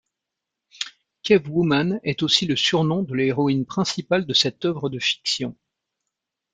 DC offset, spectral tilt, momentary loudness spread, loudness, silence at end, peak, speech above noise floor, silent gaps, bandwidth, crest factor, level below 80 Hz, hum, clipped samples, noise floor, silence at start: under 0.1%; -4.5 dB/octave; 14 LU; -21 LUFS; 1 s; -2 dBFS; 63 dB; none; 9.4 kHz; 22 dB; -60 dBFS; none; under 0.1%; -84 dBFS; 0.8 s